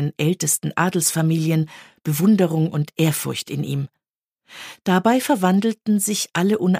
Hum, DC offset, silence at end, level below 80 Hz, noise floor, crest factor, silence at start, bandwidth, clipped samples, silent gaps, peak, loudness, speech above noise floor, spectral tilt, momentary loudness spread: none; under 0.1%; 0 s; -64 dBFS; -79 dBFS; 16 dB; 0 s; 15.5 kHz; under 0.1%; 4.09-4.22 s; -4 dBFS; -20 LUFS; 59 dB; -5 dB/octave; 10 LU